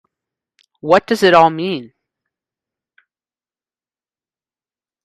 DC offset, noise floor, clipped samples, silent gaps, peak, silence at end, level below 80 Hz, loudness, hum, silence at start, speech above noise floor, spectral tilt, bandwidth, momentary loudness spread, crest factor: under 0.1%; under -90 dBFS; under 0.1%; none; 0 dBFS; 3.2 s; -60 dBFS; -13 LUFS; none; 0.85 s; over 77 dB; -5 dB/octave; 14 kHz; 16 LU; 20 dB